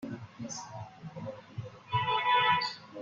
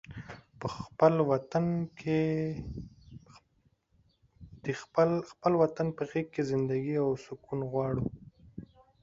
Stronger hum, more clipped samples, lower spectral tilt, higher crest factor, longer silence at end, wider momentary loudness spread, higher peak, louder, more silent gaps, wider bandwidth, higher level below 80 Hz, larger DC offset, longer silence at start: neither; neither; second, -3.5 dB/octave vs -8 dB/octave; about the same, 18 dB vs 22 dB; second, 0 s vs 0.4 s; about the same, 19 LU vs 19 LU; second, -14 dBFS vs -8 dBFS; about the same, -30 LUFS vs -31 LUFS; neither; about the same, 7.8 kHz vs 7.8 kHz; second, -68 dBFS vs -58 dBFS; neither; about the same, 0 s vs 0.1 s